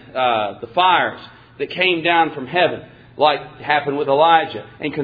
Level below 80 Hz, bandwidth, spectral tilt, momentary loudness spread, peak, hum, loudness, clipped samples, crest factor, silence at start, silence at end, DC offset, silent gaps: -58 dBFS; 5 kHz; -7 dB/octave; 13 LU; 0 dBFS; none; -17 LUFS; under 0.1%; 18 dB; 0.15 s; 0 s; under 0.1%; none